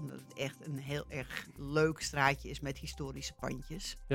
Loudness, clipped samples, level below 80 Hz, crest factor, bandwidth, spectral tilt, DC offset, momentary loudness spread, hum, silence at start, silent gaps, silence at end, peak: -37 LUFS; under 0.1%; -52 dBFS; 26 dB; 16.5 kHz; -4.5 dB/octave; under 0.1%; 12 LU; none; 0 s; none; 0 s; -12 dBFS